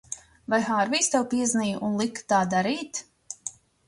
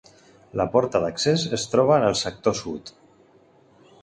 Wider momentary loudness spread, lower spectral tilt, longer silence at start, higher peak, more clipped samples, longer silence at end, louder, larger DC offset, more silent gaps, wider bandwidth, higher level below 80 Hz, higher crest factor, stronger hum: about the same, 15 LU vs 13 LU; about the same, -3.5 dB/octave vs -4.5 dB/octave; second, 0.1 s vs 0.55 s; second, -10 dBFS vs -4 dBFS; neither; second, 0.35 s vs 1.15 s; second, -25 LUFS vs -22 LUFS; neither; neither; about the same, 11.5 kHz vs 11.5 kHz; second, -66 dBFS vs -54 dBFS; about the same, 18 dB vs 20 dB; neither